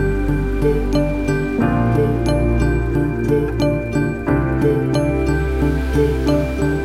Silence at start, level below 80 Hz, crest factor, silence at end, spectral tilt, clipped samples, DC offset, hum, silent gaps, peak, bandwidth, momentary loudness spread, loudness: 0 s; -24 dBFS; 14 dB; 0 s; -8 dB/octave; under 0.1%; 0.4%; none; none; -4 dBFS; 14.5 kHz; 3 LU; -18 LUFS